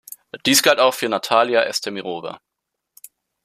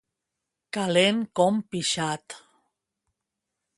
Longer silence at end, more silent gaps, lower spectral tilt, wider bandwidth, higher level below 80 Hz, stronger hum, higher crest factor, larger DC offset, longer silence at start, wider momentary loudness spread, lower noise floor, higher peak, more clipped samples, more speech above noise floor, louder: second, 1.05 s vs 1.4 s; neither; second, -2 dB/octave vs -4 dB/octave; first, 15 kHz vs 11.5 kHz; about the same, -66 dBFS vs -70 dBFS; neither; about the same, 20 dB vs 22 dB; neither; second, 0.35 s vs 0.75 s; about the same, 16 LU vs 15 LU; second, -78 dBFS vs -85 dBFS; first, -2 dBFS vs -6 dBFS; neither; about the same, 59 dB vs 60 dB; first, -18 LUFS vs -25 LUFS